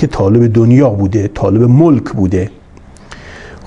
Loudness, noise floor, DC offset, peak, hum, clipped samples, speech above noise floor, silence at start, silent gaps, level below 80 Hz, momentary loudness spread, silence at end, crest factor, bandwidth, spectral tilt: -10 LUFS; -37 dBFS; under 0.1%; 0 dBFS; none; under 0.1%; 27 dB; 0 s; none; -36 dBFS; 12 LU; 0 s; 10 dB; 8 kHz; -9.5 dB/octave